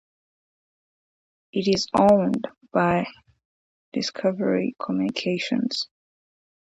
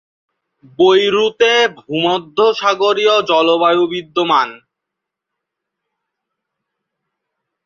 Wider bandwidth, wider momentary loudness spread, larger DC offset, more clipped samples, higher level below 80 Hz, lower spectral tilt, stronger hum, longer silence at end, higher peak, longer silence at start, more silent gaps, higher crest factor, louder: first, 10.5 kHz vs 7.2 kHz; first, 12 LU vs 5 LU; neither; neither; about the same, -60 dBFS vs -62 dBFS; first, -5.5 dB/octave vs -4 dB/octave; neither; second, 0.85 s vs 3.1 s; second, -6 dBFS vs -2 dBFS; first, 1.55 s vs 0.8 s; first, 3.45-3.92 s vs none; about the same, 20 dB vs 16 dB; second, -24 LUFS vs -14 LUFS